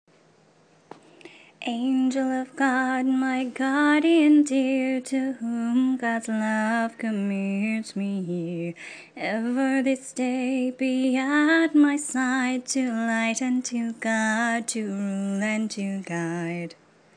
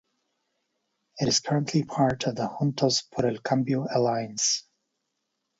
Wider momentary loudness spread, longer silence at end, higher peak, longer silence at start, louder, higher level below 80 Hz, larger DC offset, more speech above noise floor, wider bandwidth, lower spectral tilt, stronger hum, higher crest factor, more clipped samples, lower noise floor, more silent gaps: first, 10 LU vs 5 LU; second, 0.45 s vs 1 s; about the same, -10 dBFS vs -8 dBFS; about the same, 1.25 s vs 1.15 s; about the same, -24 LUFS vs -26 LUFS; second, -80 dBFS vs -62 dBFS; neither; second, 34 dB vs 54 dB; first, 10 kHz vs 8 kHz; about the same, -4.5 dB/octave vs -4.5 dB/octave; neither; about the same, 16 dB vs 20 dB; neither; second, -58 dBFS vs -80 dBFS; neither